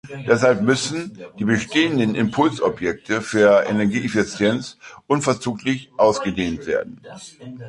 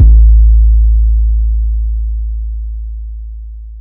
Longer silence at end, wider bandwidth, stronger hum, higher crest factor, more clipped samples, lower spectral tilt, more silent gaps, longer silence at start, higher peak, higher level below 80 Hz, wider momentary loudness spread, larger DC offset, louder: about the same, 0 s vs 0 s; first, 11.5 kHz vs 0.4 kHz; neither; first, 18 dB vs 8 dB; second, under 0.1% vs 1%; second, -5 dB/octave vs -14.5 dB/octave; neither; about the same, 0.05 s vs 0 s; about the same, -2 dBFS vs 0 dBFS; second, -52 dBFS vs -8 dBFS; second, 13 LU vs 19 LU; neither; second, -20 LUFS vs -12 LUFS